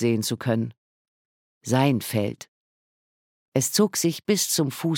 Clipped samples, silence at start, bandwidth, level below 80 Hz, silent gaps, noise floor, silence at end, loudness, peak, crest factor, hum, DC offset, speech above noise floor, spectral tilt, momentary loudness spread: under 0.1%; 0 s; 17.5 kHz; -68 dBFS; 0.77-1.61 s, 2.48-3.52 s; under -90 dBFS; 0 s; -24 LUFS; -6 dBFS; 18 dB; none; under 0.1%; over 67 dB; -4.5 dB/octave; 10 LU